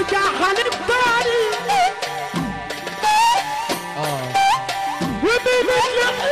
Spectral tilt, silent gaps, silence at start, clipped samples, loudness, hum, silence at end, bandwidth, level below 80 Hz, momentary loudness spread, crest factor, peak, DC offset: -3 dB/octave; none; 0 s; under 0.1%; -19 LUFS; none; 0 s; 14.5 kHz; -48 dBFS; 8 LU; 10 dB; -10 dBFS; under 0.1%